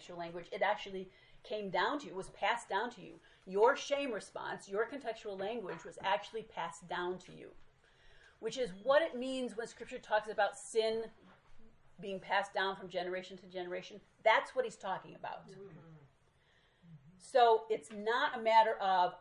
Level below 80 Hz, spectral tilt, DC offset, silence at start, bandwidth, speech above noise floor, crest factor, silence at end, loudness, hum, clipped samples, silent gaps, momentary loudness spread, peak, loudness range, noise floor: -72 dBFS; -3.5 dB/octave; under 0.1%; 0 s; 11 kHz; 34 dB; 22 dB; 0 s; -36 LUFS; none; under 0.1%; none; 17 LU; -14 dBFS; 5 LU; -70 dBFS